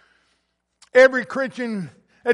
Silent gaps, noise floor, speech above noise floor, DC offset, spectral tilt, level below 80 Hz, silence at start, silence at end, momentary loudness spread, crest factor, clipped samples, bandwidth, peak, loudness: none; -71 dBFS; 53 dB; under 0.1%; -5 dB/octave; -68 dBFS; 0.95 s; 0 s; 16 LU; 18 dB; under 0.1%; 10.5 kHz; -2 dBFS; -19 LUFS